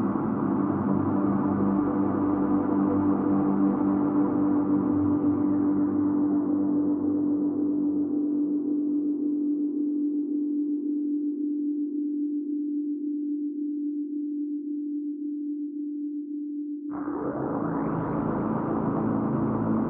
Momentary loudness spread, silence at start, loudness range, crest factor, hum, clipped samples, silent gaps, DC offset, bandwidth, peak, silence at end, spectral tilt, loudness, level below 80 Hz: 8 LU; 0 s; 7 LU; 14 dB; none; under 0.1%; none; under 0.1%; 2.5 kHz; -12 dBFS; 0 s; -11.5 dB/octave; -27 LUFS; -58 dBFS